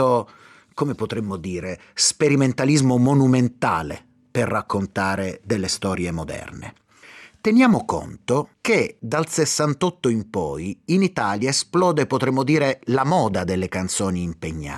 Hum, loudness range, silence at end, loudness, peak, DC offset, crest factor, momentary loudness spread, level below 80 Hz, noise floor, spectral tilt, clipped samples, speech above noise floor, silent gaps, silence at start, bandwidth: none; 4 LU; 0 s; -21 LUFS; -6 dBFS; under 0.1%; 16 dB; 12 LU; -52 dBFS; -46 dBFS; -5 dB/octave; under 0.1%; 25 dB; none; 0 s; 13.5 kHz